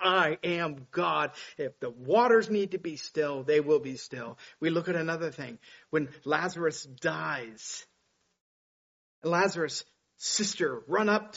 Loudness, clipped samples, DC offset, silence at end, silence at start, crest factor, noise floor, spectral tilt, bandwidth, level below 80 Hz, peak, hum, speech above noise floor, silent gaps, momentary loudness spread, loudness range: -30 LUFS; under 0.1%; under 0.1%; 0 s; 0 s; 20 dB; -74 dBFS; -3 dB/octave; 8 kHz; -76 dBFS; -10 dBFS; none; 45 dB; 8.41-9.22 s; 14 LU; 6 LU